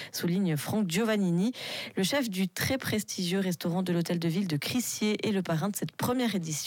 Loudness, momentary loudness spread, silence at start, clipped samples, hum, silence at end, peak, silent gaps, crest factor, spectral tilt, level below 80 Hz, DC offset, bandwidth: -30 LUFS; 4 LU; 0 s; under 0.1%; none; 0 s; -18 dBFS; none; 12 dB; -5 dB/octave; -70 dBFS; under 0.1%; 17 kHz